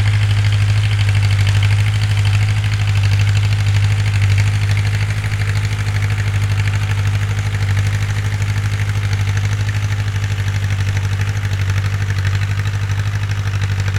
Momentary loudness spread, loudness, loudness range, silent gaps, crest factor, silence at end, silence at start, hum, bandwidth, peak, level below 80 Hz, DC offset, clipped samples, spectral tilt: 4 LU; -17 LUFS; 3 LU; none; 12 dB; 0 s; 0 s; none; 12 kHz; -2 dBFS; -30 dBFS; under 0.1%; under 0.1%; -5 dB/octave